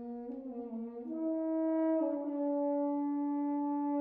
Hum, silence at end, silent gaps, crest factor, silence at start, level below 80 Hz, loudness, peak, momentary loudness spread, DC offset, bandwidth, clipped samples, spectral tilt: none; 0 s; none; 12 dB; 0 s; -78 dBFS; -35 LUFS; -24 dBFS; 11 LU; under 0.1%; 2.7 kHz; under 0.1%; -8 dB/octave